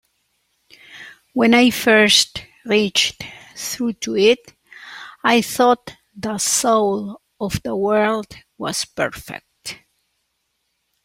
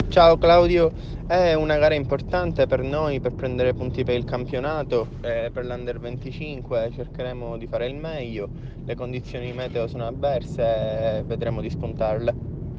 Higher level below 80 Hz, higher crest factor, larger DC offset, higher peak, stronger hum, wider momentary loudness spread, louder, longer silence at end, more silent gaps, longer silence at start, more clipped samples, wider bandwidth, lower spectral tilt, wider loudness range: second, -54 dBFS vs -38 dBFS; about the same, 18 dB vs 20 dB; neither; about the same, -2 dBFS vs -4 dBFS; neither; first, 22 LU vs 13 LU; first, -18 LUFS vs -24 LUFS; first, 1.3 s vs 0 s; neither; first, 0.9 s vs 0 s; neither; first, 16.5 kHz vs 7.4 kHz; second, -2.5 dB/octave vs -7.5 dB/octave; about the same, 7 LU vs 9 LU